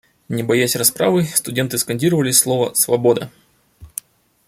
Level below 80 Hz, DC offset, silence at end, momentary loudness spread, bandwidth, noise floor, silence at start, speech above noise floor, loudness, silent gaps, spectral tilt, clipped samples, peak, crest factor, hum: -56 dBFS; under 0.1%; 0.6 s; 18 LU; 16.5 kHz; -45 dBFS; 0.3 s; 28 dB; -16 LUFS; none; -3.5 dB/octave; under 0.1%; 0 dBFS; 18 dB; none